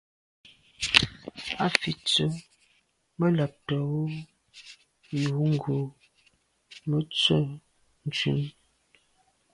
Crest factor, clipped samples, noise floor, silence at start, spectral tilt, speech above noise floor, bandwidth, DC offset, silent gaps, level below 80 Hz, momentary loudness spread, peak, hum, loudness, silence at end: 30 dB; under 0.1%; -69 dBFS; 0.8 s; -5 dB/octave; 42 dB; 11.5 kHz; under 0.1%; none; -58 dBFS; 18 LU; 0 dBFS; none; -27 LUFS; 1.05 s